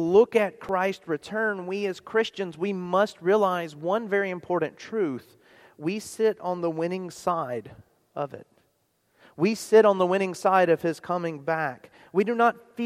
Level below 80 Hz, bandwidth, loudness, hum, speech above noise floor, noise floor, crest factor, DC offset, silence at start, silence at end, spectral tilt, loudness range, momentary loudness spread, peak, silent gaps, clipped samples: -70 dBFS; 15 kHz; -26 LUFS; none; 45 dB; -70 dBFS; 20 dB; under 0.1%; 0 s; 0 s; -5.5 dB/octave; 7 LU; 12 LU; -6 dBFS; none; under 0.1%